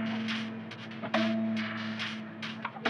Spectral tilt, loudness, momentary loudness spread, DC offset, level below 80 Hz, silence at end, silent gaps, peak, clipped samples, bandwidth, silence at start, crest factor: -5.5 dB/octave; -34 LUFS; 10 LU; under 0.1%; -90 dBFS; 0 s; none; -14 dBFS; under 0.1%; 9.6 kHz; 0 s; 20 dB